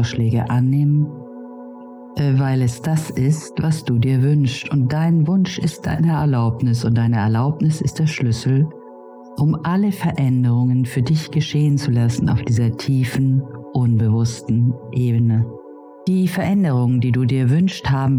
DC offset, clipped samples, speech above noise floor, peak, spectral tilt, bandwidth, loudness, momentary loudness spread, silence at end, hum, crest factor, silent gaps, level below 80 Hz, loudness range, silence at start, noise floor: under 0.1%; under 0.1%; 22 dB; -8 dBFS; -7.5 dB/octave; 14 kHz; -18 LUFS; 5 LU; 0 s; none; 10 dB; none; -46 dBFS; 2 LU; 0 s; -39 dBFS